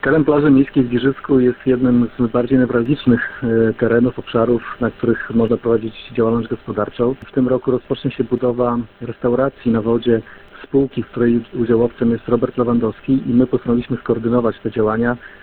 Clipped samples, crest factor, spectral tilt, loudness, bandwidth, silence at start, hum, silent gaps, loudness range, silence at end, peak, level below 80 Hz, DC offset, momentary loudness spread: under 0.1%; 16 dB; -11.5 dB/octave; -17 LUFS; 4.3 kHz; 0.05 s; none; none; 3 LU; 0.1 s; 0 dBFS; -44 dBFS; under 0.1%; 6 LU